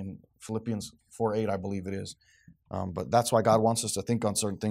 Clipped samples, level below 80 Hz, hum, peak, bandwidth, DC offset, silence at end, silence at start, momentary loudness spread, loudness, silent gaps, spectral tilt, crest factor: under 0.1%; -64 dBFS; none; -10 dBFS; 16 kHz; under 0.1%; 0 s; 0 s; 16 LU; -29 LUFS; none; -5 dB/octave; 20 dB